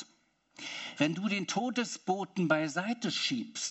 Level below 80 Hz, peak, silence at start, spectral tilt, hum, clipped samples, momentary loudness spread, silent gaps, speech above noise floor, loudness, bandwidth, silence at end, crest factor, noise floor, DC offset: -82 dBFS; -14 dBFS; 0 s; -4 dB/octave; none; under 0.1%; 10 LU; none; 37 dB; -32 LUFS; 8.2 kHz; 0 s; 20 dB; -69 dBFS; under 0.1%